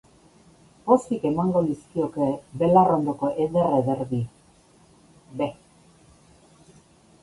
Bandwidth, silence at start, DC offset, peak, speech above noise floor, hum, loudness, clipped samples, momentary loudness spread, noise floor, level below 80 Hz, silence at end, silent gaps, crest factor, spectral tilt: 11.5 kHz; 0.85 s; under 0.1%; -4 dBFS; 34 dB; none; -23 LUFS; under 0.1%; 12 LU; -56 dBFS; -58 dBFS; 1.7 s; none; 20 dB; -8.5 dB/octave